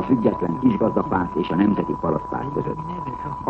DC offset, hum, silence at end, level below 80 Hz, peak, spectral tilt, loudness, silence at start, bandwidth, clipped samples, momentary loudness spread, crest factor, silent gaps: under 0.1%; none; 0 s; -46 dBFS; -4 dBFS; -9.5 dB/octave; -22 LUFS; 0 s; 6.2 kHz; under 0.1%; 9 LU; 16 dB; none